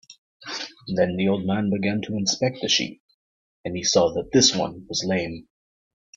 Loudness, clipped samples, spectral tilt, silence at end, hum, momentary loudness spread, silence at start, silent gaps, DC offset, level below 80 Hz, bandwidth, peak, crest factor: -23 LUFS; under 0.1%; -3.5 dB/octave; 0.75 s; none; 15 LU; 0.1 s; 0.18-0.40 s, 3.00-3.64 s; under 0.1%; -58 dBFS; 7.8 kHz; -4 dBFS; 20 dB